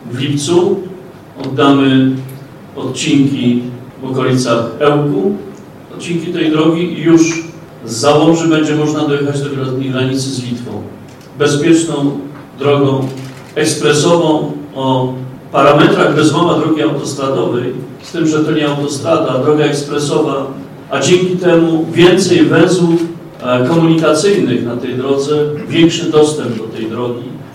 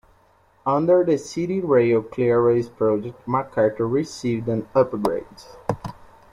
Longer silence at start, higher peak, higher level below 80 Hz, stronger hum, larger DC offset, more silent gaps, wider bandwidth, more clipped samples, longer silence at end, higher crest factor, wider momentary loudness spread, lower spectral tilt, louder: second, 0 s vs 0.65 s; first, 0 dBFS vs -6 dBFS; about the same, -52 dBFS vs -54 dBFS; neither; neither; neither; first, 13.5 kHz vs 12 kHz; first, 0.1% vs under 0.1%; second, 0 s vs 0.4 s; about the same, 12 dB vs 16 dB; about the same, 14 LU vs 12 LU; second, -5.5 dB/octave vs -7.5 dB/octave; first, -13 LUFS vs -22 LUFS